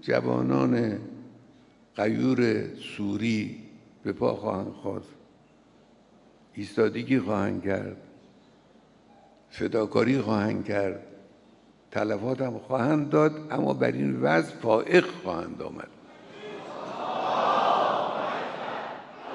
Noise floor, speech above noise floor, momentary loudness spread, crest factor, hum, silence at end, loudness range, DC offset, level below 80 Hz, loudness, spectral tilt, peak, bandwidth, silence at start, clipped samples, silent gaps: -58 dBFS; 32 dB; 17 LU; 22 dB; none; 0 s; 6 LU; under 0.1%; -68 dBFS; -27 LUFS; -7 dB/octave; -6 dBFS; 11 kHz; 0.05 s; under 0.1%; none